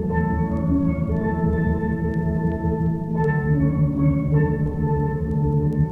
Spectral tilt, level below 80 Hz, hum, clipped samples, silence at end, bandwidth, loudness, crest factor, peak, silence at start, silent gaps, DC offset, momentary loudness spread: -11.5 dB/octave; -32 dBFS; none; under 0.1%; 0 s; 2.8 kHz; -22 LUFS; 12 dB; -8 dBFS; 0 s; none; under 0.1%; 3 LU